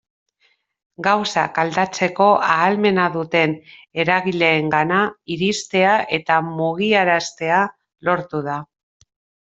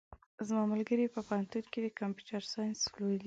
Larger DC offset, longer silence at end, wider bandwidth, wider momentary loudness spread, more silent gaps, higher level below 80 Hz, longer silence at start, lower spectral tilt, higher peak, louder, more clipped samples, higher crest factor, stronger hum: neither; first, 0.85 s vs 0 s; about the same, 8.2 kHz vs 7.8 kHz; about the same, 8 LU vs 8 LU; second, none vs 0.26-0.38 s; first, -62 dBFS vs -70 dBFS; first, 1 s vs 0.1 s; about the same, -4.5 dB/octave vs -4.5 dB/octave; first, -2 dBFS vs -22 dBFS; first, -18 LUFS vs -36 LUFS; neither; about the same, 18 dB vs 16 dB; neither